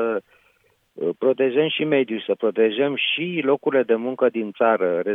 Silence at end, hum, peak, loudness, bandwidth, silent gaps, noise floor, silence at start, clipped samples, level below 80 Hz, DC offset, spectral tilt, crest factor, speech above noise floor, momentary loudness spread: 0 s; none; -6 dBFS; -21 LUFS; 3.9 kHz; none; -62 dBFS; 0 s; under 0.1%; -78 dBFS; under 0.1%; -8 dB/octave; 16 dB; 42 dB; 5 LU